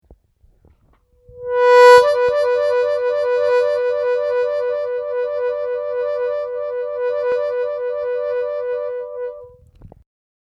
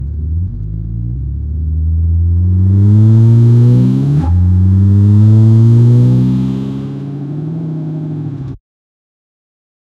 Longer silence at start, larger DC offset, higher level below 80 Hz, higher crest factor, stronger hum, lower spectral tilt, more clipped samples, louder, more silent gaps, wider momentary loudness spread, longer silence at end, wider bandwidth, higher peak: about the same, 0.1 s vs 0 s; neither; second, -56 dBFS vs -24 dBFS; first, 18 dB vs 10 dB; neither; second, -2 dB/octave vs -11 dB/octave; neither; second, -17 LUFS vs -11 LUFS; neither; about the same, 13 LU vs 14 LU; second, 0.6 s vs 1.4 s; first, 12 kHz vs 4.1 kHz; about the same, 0 dBFS vs 0 dBFS